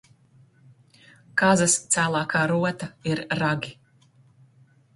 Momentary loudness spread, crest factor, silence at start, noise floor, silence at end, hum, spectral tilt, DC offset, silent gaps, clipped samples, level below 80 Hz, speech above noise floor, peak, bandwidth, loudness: 10 LU; 22 dB; 1.35 s; -58 dBFS; 1.25 s; none; -4 dB/octave; under 0.1%; none; under 0.1%; -62 dBFS; 35 dB; -4 dBFS; 11.5 kHz; -23 LUFS